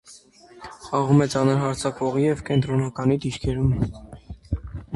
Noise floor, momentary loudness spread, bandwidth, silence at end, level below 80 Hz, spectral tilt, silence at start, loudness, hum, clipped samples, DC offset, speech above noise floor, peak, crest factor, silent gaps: -49 dBFS; 22 LU; 11.5 kHz; 0 s; -40 dBFS; -7 dB/octave; 0.1 s; -23 LUFS; none; under 0.1%; under 0.1%; 27 dB; -6 dBFS; 18 dB; none